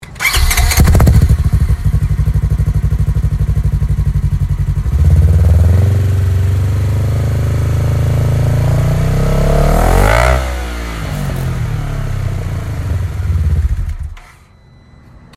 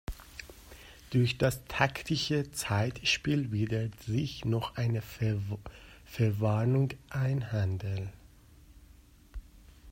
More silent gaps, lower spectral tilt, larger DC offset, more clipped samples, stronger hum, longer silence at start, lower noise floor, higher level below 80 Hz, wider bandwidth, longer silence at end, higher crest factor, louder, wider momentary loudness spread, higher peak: neither; about the same, -6 dB/octave vs -5.5 dB/octave; neither; neither; neither; about the same, 0 s vs 0.1 s; second, -42 dBFS vs -57 dBFS; first, -16 dBFS vs -52 dBFS; about the same, 15.5 kHz vs 16 kHz; first, 1.15 s vs 0 s; second, 12 dB vs 22 dB; first, -14 LUFS vs -31 LUFS; second, 10 LU vs 22 LU; first, 0 dBFS vs -10 dBFS